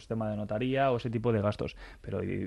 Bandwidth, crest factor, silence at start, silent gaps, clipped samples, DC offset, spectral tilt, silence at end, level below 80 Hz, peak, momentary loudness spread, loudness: 11 kHz; 16 dB; 0 s; none; under 0.1%; under 0.1%; -8 dB/octave; 0 s; -54 dBFS; -16 dBFS; 10 LU; -31 LUFS